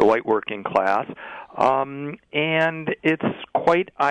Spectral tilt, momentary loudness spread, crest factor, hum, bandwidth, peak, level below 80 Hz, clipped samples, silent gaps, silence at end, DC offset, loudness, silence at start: -6.5 dB/octave; 10 LU; 16 dB; none; 10 kHz; -6 dBFS; -62 dBFS; under 0.1%; none; 0 s; under 0.1%; -22 LUFS; 0 s